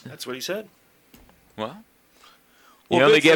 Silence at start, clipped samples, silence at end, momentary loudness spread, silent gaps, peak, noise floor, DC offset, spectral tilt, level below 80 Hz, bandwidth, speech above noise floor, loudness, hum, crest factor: 0.05 s; under 0.1%; 0 s; 18 LU; none; -2 dBFS; -56 dBFS; under 0.1%; -4 dB/octave; -66 dBFS; 19 kHz; 36 dB; -23 LUFS; none; 22 dB